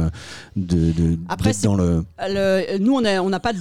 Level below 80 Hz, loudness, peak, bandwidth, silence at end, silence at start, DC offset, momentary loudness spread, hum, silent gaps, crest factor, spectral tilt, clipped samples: -36 dBFS; -20 LUFS; -6 dBFS; 13.5 kHz; 0 s; 0 s; 0.6%; 7 LU; none; none; 14 dB; -6 dB/octave; under 0.1%